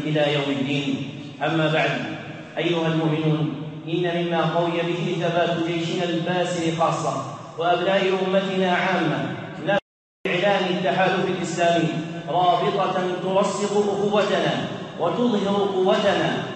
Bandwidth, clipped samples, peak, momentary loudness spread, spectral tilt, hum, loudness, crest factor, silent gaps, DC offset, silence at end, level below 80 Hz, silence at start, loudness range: 8.8 kHz; under 0.1%; -8 dBFS; 8 LU; -5.5 dB/octave; none; -22 LUFS; 16 dB; 9.82-10.24 s; under 0.1%; 0 s; -66 dBFS; 0 s; 2 LU